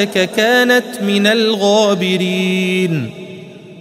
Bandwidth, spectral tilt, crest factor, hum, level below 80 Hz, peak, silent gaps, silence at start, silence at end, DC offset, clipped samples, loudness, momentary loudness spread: 16 kHz; -4.5 dB/octave; 14 dB; none; -62 dBFS; 0 dBFS; none; 0 s; 0 s; under 0.1%; under 0.1%; -14 LUFS; 14 LU